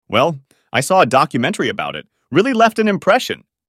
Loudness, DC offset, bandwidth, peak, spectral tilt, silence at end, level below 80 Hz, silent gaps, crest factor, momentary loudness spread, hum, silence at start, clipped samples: -16 LUFS; under 0.1%; 16 kHz; 0 dBFS; -4.5 dB/octave; 0.35 s; -58 dBFS; none; 16 dB; 12 LU; none; 0.1 s; under 0.1%